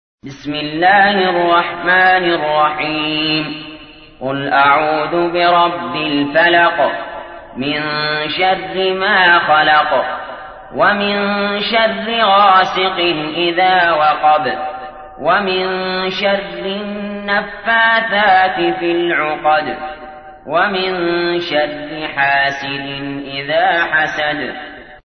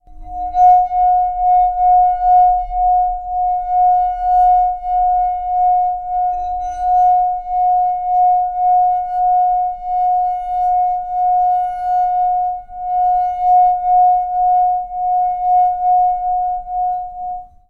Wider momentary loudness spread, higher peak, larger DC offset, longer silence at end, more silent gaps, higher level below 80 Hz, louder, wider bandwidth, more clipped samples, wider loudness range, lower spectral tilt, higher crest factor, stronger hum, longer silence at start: first, 14 LU vs 8 LU; first, 0 dBFS vs -4 dBFS; neither; second, 0.1 s vs 0.25 s; neither; second, -48 dBFS vs -38 dBFS; about the same, -14 LUFS vs -15 LUFS; first, 6.4 kHz vs 3.1 kHz; neither; about the same, 4 LU vs 3 LU; about the same, -5.5 dB/octave vs -5.5 dB/octave; about the same, 14 dB vs 12 dB; neither; first, 0.25 s vs 0.1 s